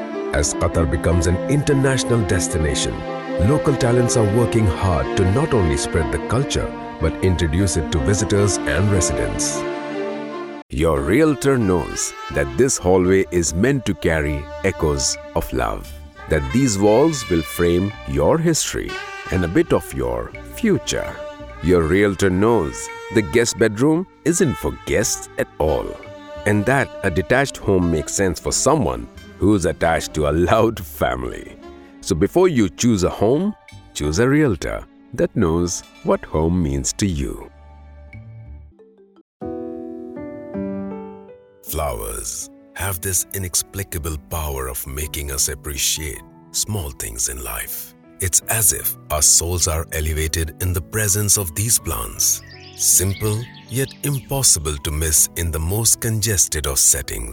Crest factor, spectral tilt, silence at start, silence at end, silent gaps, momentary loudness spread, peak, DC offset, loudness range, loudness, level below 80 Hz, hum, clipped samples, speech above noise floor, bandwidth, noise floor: 18 dB; -4 dB/octave; 0 s; 0 s; 10.62-10.69 s, 39.21-39.40 s; 13 LU; -2 dBFS; under 0.1%; 6 LU; -19 LUFS; -34 dBFS; none; under 0.1%; 30 dB; 19.5 kHz; -49 dBFS